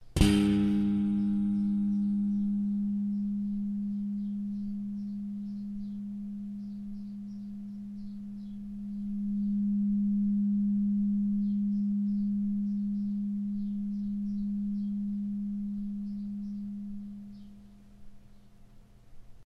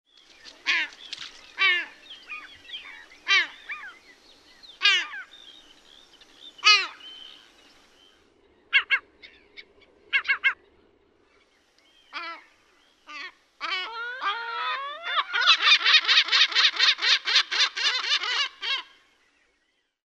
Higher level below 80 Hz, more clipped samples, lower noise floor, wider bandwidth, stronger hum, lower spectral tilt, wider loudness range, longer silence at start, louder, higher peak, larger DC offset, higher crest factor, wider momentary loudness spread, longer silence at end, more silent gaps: first, -48 dBFS vs -74 dBFS; neither; second, -54 dBFS vs -72 dBFS; about the same, 11.5 kHz vs 12.5 kHz; neither; first, -7.5 dB/octave vs 3 dB/octave; about the same, 11 LU vs 13 LU; second, 0 s vs 0.45 s; second, -32 LUFS vs -21 LUFS; second, -10 dBFS vs -2 dBFS; neither; about the same, 22 dB vs 24 dB; second, 13 LU vs 22 LU; second, 0.05 s vs 1.25 s; neither